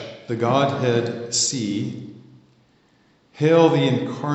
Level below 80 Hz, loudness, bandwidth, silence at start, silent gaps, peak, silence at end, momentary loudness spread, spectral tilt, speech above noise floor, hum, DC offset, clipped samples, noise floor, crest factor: -70 dBFS; -20 LUFS; 8.2 kHz; 0 s; none; -2 dBFS; 0 s; 15 LU; -4.5 dB/octave; 39 dB; none; under 0.1%; under 0.1%; -59 dBFS; 20 dB